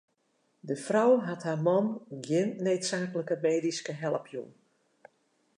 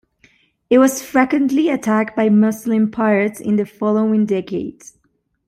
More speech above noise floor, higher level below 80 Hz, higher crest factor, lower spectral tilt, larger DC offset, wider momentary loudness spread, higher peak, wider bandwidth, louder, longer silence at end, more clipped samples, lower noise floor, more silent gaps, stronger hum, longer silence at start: second, 45 dB vs 49 dB; second, -84 dBFS vs -58 dBFS; about the same, 18 dB vs 16 dB; about the same, -5.5 dB/octave vs -6 dB/octave; neither; first, 14 LU vs 6 LU; second, -12 dBFS vs -2 dBFS; second, 11 kHz vs 16 kHz; second, -29 LUFS vs -17 LUFS; first, 1.05 s vs 0.75 s; neither; first, -74 dBFS vs -65 dBFS; neither; neither; about the same, 0.65 s vs 0.7 s